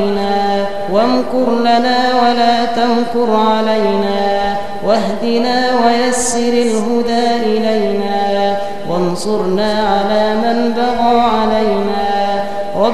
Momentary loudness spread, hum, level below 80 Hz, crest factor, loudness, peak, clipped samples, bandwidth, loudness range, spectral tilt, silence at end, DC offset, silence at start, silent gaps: 5 LU; none; -42 dBFS; 14 dB; -14 LUFS; 0 dBFS; under 0.1%; 13.5 kHz; 2 LU; -4.5 dB/octave; 0 s; 7%; 0 s; none